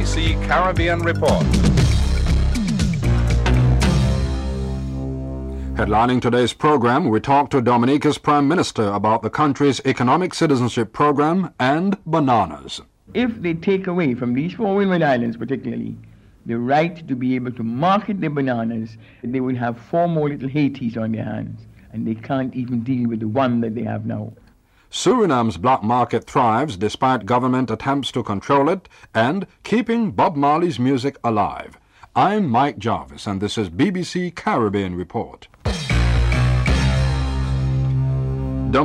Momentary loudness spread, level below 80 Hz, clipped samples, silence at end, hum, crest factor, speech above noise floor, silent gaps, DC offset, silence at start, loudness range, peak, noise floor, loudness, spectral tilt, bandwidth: 10 LU; -28 dBFS; under 0.1%; 0 s; none; 14 dB; 34 dB; none; under 0.1%; 0 s; 5 LU; -4 dBFS; -53 dBFS; -20 LUFS; -6.5 dB/octave; 12 kHz